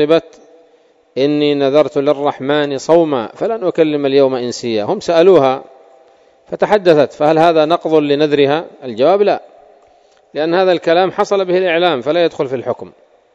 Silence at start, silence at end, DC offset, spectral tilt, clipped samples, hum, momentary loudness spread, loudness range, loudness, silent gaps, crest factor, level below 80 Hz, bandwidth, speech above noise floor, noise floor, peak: 0 s; 0.45 s; under 0.1%; -6 dB/octave; 0.2%; none; 9 LU; 2 LU; -14 LUFS; none; 14 dB; -60 dBFS; 8 kHz; 38 dB; -51 dBFS; 0 dBFS